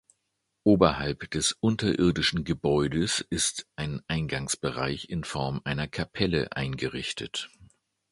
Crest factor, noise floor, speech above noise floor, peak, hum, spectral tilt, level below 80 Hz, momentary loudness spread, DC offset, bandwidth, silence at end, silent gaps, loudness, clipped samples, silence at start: 24 dB; -79 dBFS; 52 dB; -4 dBFS; none; -4.5 dB/octave; -48 dBFS; 9 LU; under 0.1%; 11.5 kHz; 0.45 s; none; -28 LUFS; under 0.1%; 0.65 s